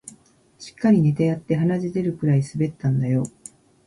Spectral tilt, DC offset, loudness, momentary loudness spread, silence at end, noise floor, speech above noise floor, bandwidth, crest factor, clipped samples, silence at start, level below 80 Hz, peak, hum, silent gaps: -8 dB/octave; under 0.1%; -22 LUFS; 9 LU; 0.55 s; -54 dBFS; 33 dB; 11.5 kHz; 16 dB; under 0.1%; 0.05 s; -56 dBFS; -6 dBFS; none; none